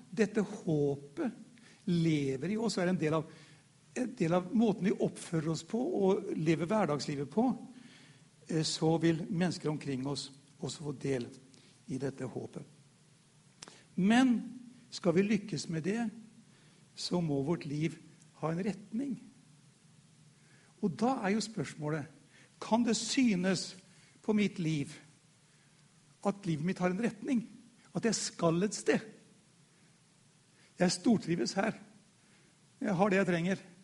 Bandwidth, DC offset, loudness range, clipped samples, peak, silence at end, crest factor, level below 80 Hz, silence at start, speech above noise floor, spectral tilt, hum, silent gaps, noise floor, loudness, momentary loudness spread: 11.5 kHz; under 0.1%; 5 LU; under 0.1%; -14 dBFS; 0.15 s; 20 dB; -72 dBFS; 0.1 s; 33 dB; -5.5 dB/octave; none; none; -65 dBFS; -33 LUFS; 14 LU